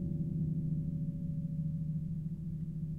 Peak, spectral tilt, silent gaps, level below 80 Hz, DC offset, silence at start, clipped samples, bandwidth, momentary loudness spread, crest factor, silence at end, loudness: -26 dBFS; -12 dB/octave; none; -52 dBFS; under 0.1%; 0 s; under 0.1%; 0.8 kHz; 5 LU; 10 dB; 0 s; -37 LUFS